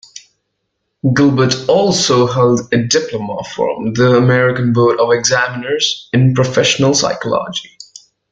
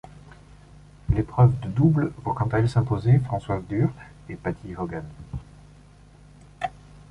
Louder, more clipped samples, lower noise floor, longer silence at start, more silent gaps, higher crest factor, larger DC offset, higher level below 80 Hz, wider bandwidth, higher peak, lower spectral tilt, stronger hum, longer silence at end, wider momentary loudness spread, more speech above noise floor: first, -13 LUFS vs -24 LUFS; neither; first, -71 dBFS vs -50 dBFS; about the same, 0.15 s vs 0.1 s; neither; about the same, 14 dB vs 18 dB; neither; second, -50 dBFS vs -42 dBFS; about the same, 9 kHz vs 9 kHz; first, 0 dBFS vs -6 dBFS; second, -4.5 dB/octave vs -9 dB/octave; second, none vs 50 Hz at -45 dBFS; first, 0.65 s vs 0.15 s; second, 8 LU vs 19 LU; first, 58 dB vs 27 dB